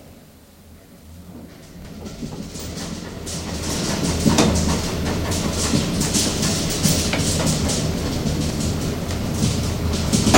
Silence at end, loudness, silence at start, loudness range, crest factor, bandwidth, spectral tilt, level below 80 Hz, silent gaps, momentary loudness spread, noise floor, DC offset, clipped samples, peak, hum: 0 s; -21 LUFS; 0 s; 12 LU; 22 dB; 16.5 kHz; -4 dB/octave; -32 dBFS; none; 17 LU; -46 dBFS; under 0.1%; under 0.1%; 0 dBFS; none